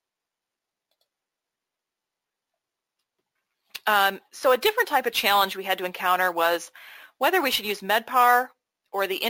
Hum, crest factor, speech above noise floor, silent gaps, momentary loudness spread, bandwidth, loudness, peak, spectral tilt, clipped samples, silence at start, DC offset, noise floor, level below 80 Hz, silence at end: none; 20 dB; 64 dB; none; 10 LU; 17 kHz; -23 LUFS; -6 dBFS; -1.5 dB/octave; under 0.1%; 3.75 s; under 0.1%; -87 dBFS; -70 dBFS; 0 s